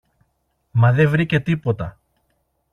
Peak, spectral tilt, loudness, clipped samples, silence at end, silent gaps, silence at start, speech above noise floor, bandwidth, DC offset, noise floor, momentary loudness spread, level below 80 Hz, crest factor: -4 dBFS; -8.5 dB/octave; -19 LUFS; under 0.1%; 0.8 s; none; 0.75 s; 52 dB; 6.6 kHz; under 0.1%; -69 dBFS; 11 LU; -48 dBFS; 16 dB